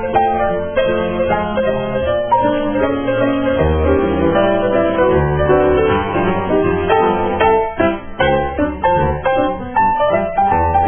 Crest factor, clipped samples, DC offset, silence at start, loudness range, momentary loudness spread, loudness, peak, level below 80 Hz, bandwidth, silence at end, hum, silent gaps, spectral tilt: 14 dB; under 0.1%; 0.5%; 0 s; 2 LU; 4 LU; -15 LUFS; 0 dBFS; -30 dBFS; 3.5 kHz; 0 s; none; none; -11 dB/octave